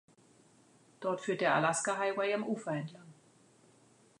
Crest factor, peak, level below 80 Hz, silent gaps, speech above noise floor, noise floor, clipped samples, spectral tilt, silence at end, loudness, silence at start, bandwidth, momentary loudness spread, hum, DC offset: 20 dB; -16 dBFS; -86 dBFS; none; 32 dB; -65 dBFS; under 0.1%; -4 dB/octave; 1.1 s; -33 LUFS; 1 s; 11 kHz; 11 LU; none; under 0.1%